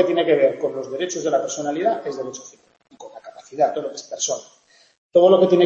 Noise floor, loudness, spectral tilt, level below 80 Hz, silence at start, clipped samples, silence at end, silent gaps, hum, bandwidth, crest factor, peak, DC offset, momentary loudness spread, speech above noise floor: -40 dBFS; -20 LUFS; -4 dB/octave; -70 dBFS; 0 s; under 0.1%; 0 s; 4.98-5.09 s; none; 8 kHz; 18 dB; -4 dBFS; under 0.1%; 22 LU; 21 dB